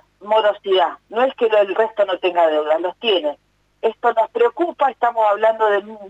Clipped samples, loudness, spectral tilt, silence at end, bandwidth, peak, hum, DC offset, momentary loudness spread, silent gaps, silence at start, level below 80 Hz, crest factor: under 0.1%; -18 LUFS; -4.5 dB/octave; 0 s; 7.8 kHz; -6 dBFS; 50 Hz at -65 dBFS; under 0.1%; 4 LU; none; 0.2 s; -68 dBFS; 12 dB